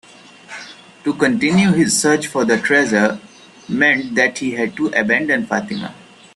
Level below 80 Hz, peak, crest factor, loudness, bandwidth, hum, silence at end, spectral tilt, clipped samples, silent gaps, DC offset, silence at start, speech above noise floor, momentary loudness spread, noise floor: -56 dBFS; 0 dBFS; 18 dB; -16 LUFS; 12.5 kHz; none; 0.4 s; -4 dB/octave; under 0.1%; none; under 0.1%; 0.5 s; 25 dB; 18 LU; -41 dBFS